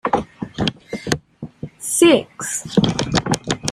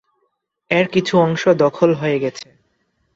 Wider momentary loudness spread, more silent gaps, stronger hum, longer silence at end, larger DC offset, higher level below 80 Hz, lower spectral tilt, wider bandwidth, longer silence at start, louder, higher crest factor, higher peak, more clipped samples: first, 17 LU vs 7 LU; neither; neither; second, 0 s vs 0.7 s; neither; first, -44 dBFS vs -60 dBFS; second, -4 dB/octave vs -6.5 dB/octave; first, 15 kHz vs 7.8 kHz; second, 0.05 s vs 0.7 s; about the same, -19 LUFS vs -17 LUFS; about the same, 20 dB vs 16 dB; about the same, 0 dBFS vs -2 dBFS; neither